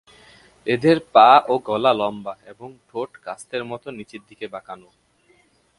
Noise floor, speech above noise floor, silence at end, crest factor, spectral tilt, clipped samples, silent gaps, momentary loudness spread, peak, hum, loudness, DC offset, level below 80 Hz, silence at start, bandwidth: -59 dBFS; 39 dB; 1.05 s; 22 dB; -5.5 dB/octave; under 0.1%; none; 26 LU; 0 dBFS; none; -18 LUFS; under 0.1%; -64 dBFS; 0.65 s; 11.5 kHz